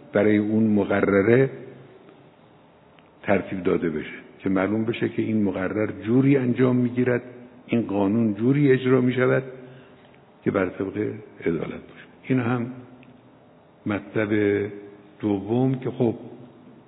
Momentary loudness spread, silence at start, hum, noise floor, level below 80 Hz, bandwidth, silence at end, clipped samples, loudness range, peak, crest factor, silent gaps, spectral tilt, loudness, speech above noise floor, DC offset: 15 LU; 0.15 s; none; -53 dBFS; -64 dBFS; 4.1 kHz; 0.15 s; under 0.1%; 7 LU; -4 dBFS; 20 dB; none; -12 dB/octave; -23 LUFS; 31 dB; under 0.1%